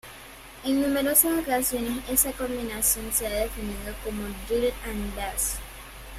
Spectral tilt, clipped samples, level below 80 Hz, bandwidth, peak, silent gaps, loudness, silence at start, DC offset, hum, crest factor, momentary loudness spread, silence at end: -3 dB/octave; under 0.1%; -42 dBFS; 16 kHz; -4 dBFS; none; -26 LUFS; 0.05 s; under 0.1%; none; 24 dB; 15 LU; 0 s